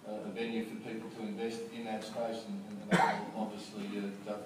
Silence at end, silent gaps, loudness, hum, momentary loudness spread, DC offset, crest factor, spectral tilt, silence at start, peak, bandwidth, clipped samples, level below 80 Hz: 0 s; none; -37 LUFS; none; 13 LU; under 0.1%; 22 dB; -5.5 dB/octave; 0 s; -16 dBFS; 15.5 kHz; under 0.1%; -76 dBFS